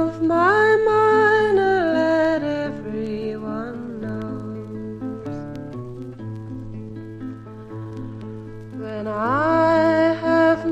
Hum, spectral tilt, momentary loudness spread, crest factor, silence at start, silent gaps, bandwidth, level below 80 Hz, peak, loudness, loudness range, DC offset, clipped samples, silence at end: none; -7 dB/octave; 19 LU; 16 dB; 0 s; none; 10 kHz; -50 dBFS; -6 dBFS; -20 LUFS; 15 LU; under 0.1%; under 0.1%; 0 s